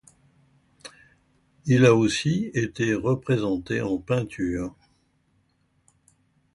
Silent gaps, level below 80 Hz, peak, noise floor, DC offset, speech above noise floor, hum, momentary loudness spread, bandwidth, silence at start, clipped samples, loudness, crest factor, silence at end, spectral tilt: none; -52 dBFS; -6 dBFS; -67 dBFS; under 0.1%; 45 dB; none; 21 LU; 11.5 kHz; 0.85 s; under 0.1%; -24 LUFS; 20 dB; 1.85 s; -6 dB/octave